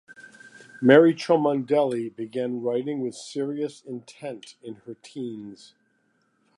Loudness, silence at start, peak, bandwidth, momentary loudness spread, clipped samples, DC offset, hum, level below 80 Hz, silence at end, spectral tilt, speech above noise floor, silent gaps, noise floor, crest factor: -23 LUFS; 0.1 s; -2 dBFS; 11 kHz; 23 LU; under 0.1%; under 0.1%; none; -80 dBFS; 1.05 s; -6.5 dB/octave; 45 dB; none; -69 dBFS; 24 dB